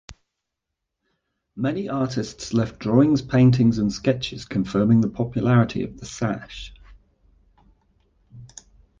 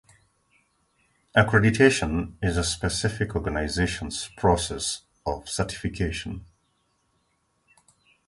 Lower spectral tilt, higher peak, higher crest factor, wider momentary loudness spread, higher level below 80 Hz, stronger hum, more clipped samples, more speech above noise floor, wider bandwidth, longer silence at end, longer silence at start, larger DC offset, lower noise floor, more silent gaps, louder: first, -7 dB/octave vs -4.5 dB/octave; about the same, -6 dBFS vs -4 dBFS; about the same, 18 dB vs 22 dB; first, 17 LU vs 13 LU; second, -48 dBFS vs -40 dBFS; neither; neither; first, 61 dB vs 46 dB; second, 7.6 kHz vs 11.5 kHz; second, 0.55 s vs 1.85 s; second, 0.1 s vs 1.35 s; neither; first, -82 dBFS vs -71 dBFS; neither; first, -22 LUFS vs -25 LUFS